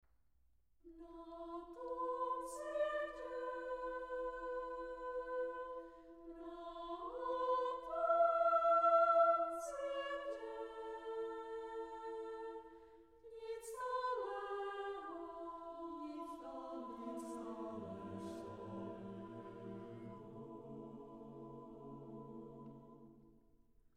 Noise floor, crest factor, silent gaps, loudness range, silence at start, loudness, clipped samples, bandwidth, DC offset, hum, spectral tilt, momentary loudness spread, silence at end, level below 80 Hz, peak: -77 dBFS; 20 dB; none; 17 LU; 0.85 s; -41 LUFS; under 0.1%; 13.5 kHz; under 0.1%; none; -5.5 dB/octave; 20 LU; 0.65 s; -72 dBFS; -22 dBFS